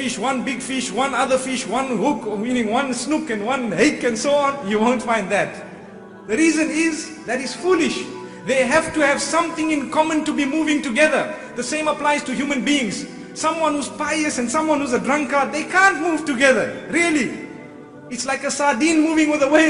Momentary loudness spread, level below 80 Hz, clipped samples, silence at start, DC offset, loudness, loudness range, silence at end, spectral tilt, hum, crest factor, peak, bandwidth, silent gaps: 10 LU; -56 dBFS; under 0.1%; 0 s; under 0.1%; -19 LUFS; 3 LU; 0 s; -3.5 dB/octave; none; 18 dB; -2 dBFS; 11 kHz; none